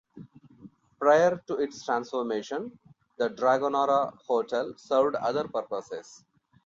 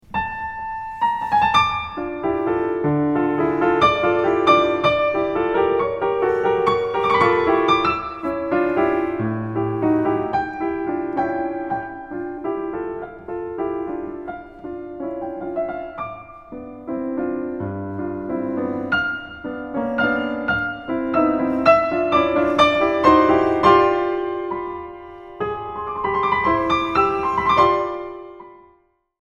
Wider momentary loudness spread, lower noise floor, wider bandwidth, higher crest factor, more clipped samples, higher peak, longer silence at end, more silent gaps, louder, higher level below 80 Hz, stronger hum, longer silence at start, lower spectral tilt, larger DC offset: about the same, 13 LU vs 15 LU; second, -53 dBFS vs -59 dBFS; second, 7.6 kHz vs 9.4 kHz; about the same, 18 dB vs 20 dB; neither; second, -10 dBFS vs -2 dBFS; second, 0.5 s vs 0.65 s; neither; second, -27 LUFS vs -20 LUFS; second, -72 dBFS vs -46 dBFS; neither; about the same, 0.15 s vs 0.1 s; second, -5 dB/octave vs -6.5 dB/octave; neither